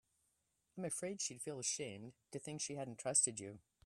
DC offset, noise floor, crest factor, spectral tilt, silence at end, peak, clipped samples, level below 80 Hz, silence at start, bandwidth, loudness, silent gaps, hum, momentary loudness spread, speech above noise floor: under 0.1%; -83 dBFS; 24 dB; -2.5 dB/octave; 0.25 s; -20 dBFS; under 0.1%; -82 dBFS; 0.75 s; 14.5 kHz; -40 LUFS; none; none; 18 LU; 40 dB